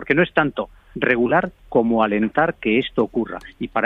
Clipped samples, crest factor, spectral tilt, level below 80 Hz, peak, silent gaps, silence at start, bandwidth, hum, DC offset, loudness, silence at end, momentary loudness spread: under 0.1%; 18 dB; -8 dB/octave; -48 dBFS; -2 dBFS; none; 0 s; 4.9 kHz; none; under 0.1%; -20 LUFS; 0 s; 11 LU